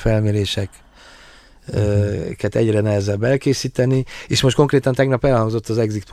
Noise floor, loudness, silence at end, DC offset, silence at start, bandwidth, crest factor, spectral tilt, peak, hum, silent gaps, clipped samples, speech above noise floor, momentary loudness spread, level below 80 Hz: -45 dBFS; -18 LUFS; 0 s; under 0.1%; 0 s; 14 kHz; 16 dB; -6 dB/octave; -2 dBFS; none; none; under 0.1%; 28 dB; 7 LU; -38 dBFS